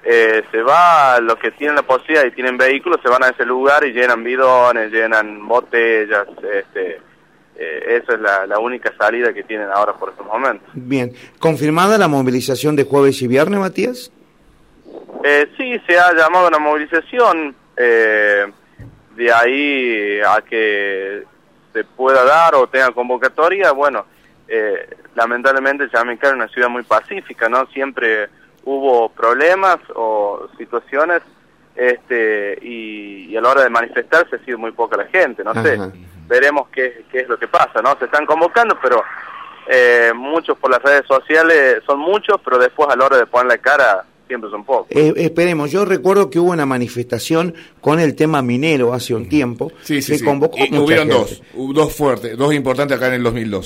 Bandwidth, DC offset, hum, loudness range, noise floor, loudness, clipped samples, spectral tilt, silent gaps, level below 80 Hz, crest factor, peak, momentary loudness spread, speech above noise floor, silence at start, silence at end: 16 kHz; under 0.1%; none; 5 LU; -50 dBFS; -14 LUFS; under 0.1%; -5 dB/octave; none; -54 dBFS; 14 dB; 0 dBFS; 12 LU; 35 dB; 0.05 s; 0 s